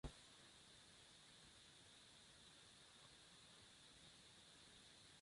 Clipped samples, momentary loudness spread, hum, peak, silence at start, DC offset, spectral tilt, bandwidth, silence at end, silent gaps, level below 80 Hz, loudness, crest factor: under 0.1%; 1 LU; none; -38 dBFS; 0.05 s; under 0.1%; -2.5 dB/octave; 11.5 kHz; 0 s; none; -72 dBFS; -64 LUFS; 26 dB